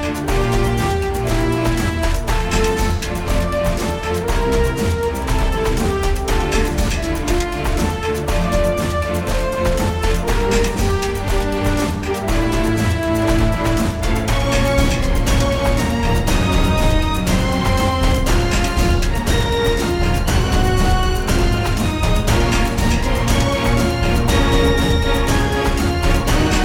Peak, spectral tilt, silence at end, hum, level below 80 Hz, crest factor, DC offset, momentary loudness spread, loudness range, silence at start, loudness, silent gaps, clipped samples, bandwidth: -2 dBFS; -5 dB/octave; 0 s; none; -20 dBFS; 14 dB; under 0.1%; 4 LU; 3 LU; 0 s; -18 LUFS; none; under 0.1%; 17 kHz